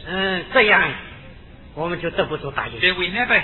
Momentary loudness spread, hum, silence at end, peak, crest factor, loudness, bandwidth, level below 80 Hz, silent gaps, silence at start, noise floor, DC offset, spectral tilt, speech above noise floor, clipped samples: 16 LU; none; 0 s; -2 dBFS; 20 dB; -19 LUFS; 4.3 kHz; -44 dBFS; none; 0 s; -41 dBFS; under 0.1%; -7.5 dB/octave; 21 dB; under 0.1%